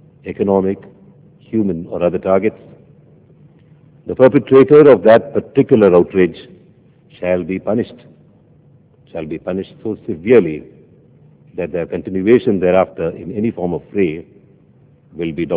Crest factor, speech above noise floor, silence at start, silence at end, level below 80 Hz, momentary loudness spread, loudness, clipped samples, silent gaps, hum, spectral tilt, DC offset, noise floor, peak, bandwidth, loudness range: 16 dB; 35 dB; 0.25 s; 0 s; -48 dBFS; 17 LU; -15 LUFS; 0.3%; none; none; -11.5 dB/octave; under 0.1%; -49 dBFS; 0 dBFS; 4 kHz; 10 LU